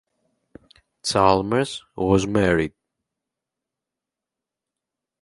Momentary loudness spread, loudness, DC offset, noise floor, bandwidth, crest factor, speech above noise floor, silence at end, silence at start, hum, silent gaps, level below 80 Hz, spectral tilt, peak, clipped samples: 11 LU; -21 LUFS; under 0.1%; -87 dBFS; 11.5 kHz; 22 dB; 67 dB; 2.55 s; 1.05 s; none; none; -46 dBFS; -5 dB/octave; -2 dBFS; under 0.1%